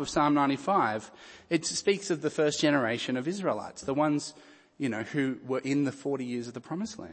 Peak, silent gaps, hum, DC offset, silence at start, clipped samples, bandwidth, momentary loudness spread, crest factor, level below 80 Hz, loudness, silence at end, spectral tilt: -12 dBFS; none; none; under 0.1%; 0 s; under 0.1%; 8.8 kHz; 10 LU; 18 dB; -66 dBFS; -29 LUFS; 0 s; -4.5 dB/octave